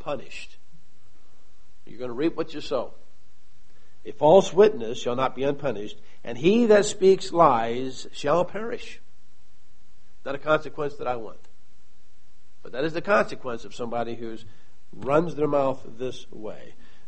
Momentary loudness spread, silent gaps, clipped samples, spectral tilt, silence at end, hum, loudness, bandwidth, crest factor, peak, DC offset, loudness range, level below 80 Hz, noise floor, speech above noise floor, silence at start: 21 LU; none; under 0.1%; -5.5 dB/octave; 0.4 s; none; -24 LUFS; 8.4 kHz; 22 dB; -4 dBFS; 3%; 10 LU; -56 dBFS; -62 dBFS; 38 dB; 0.05 s